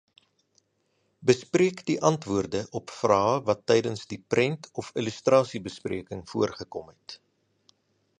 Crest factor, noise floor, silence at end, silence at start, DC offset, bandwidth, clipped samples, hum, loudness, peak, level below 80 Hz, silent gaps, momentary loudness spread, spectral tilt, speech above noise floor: 24 dB; -73 dBFS; 1.05 s; 1.2 s; under 0.1%; 10 kHz; under 0.1%; none; -26 LUFS; -4 dBFS; -60 dBFS; none; 15 LU; -5.5 dB/octave; 46 dB